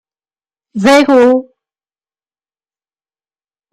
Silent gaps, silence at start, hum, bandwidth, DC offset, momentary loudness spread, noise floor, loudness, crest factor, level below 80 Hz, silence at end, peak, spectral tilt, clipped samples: none; 0.75 s; none; 15 kHz; under 0.1%; 10 LU; under -90 dBFS; -9 LUFS; 14 dB; -56 dBFS; 2.3 s; 0 dBFS; -5 dB/octave; under 0.1%